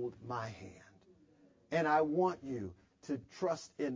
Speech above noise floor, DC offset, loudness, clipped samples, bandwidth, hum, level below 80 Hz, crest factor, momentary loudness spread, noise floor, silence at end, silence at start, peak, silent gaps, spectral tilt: 31 dB; under 0.1%; -36 LUFS; under 0.1%; 7.6 kHz; none; -68 dBFS; 20 dB; 18 LU; -66 dBFS; 0 s; 0 s; -18 dBFS; none; -6.5 dB/octave